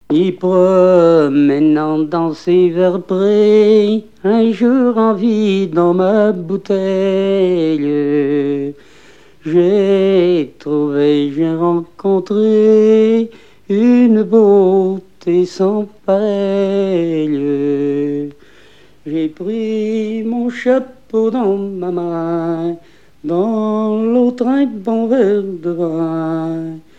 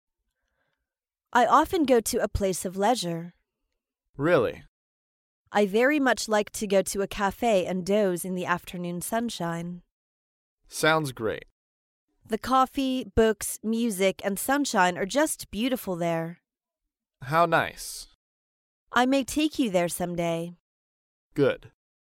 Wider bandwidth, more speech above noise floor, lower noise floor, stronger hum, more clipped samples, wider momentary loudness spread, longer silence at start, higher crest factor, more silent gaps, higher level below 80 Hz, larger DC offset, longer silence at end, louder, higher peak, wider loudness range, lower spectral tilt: second, 8 kHz vs 17 kHz; second, 33 dB vs 63 dB; second, -46 dBFS vs -89 dBFS; neither; neither; about the same, 10 LU vs 12 LU; second, 0.1 s vs 1.3 s; second, 14 dB vs 20 dB; second, none vs 4.09-4.14 s, 4.68-5.45 s, 9.91-10.58 s, 11.51-12.08 s, 18.15-18.87 s, 20.60-21.31 s; second, -58 dBFS vs -50 dBFS; first, 0.6% vs under 0.1%; second, 0.2 s vs 0.45 s; first, -14 LUFS vs -26 LUFS; first, 0 dBFS vs -6 dBFS; about the same, 6 LU vs 4 LU; first, -8 dB/octave vs -4.5 dB/octave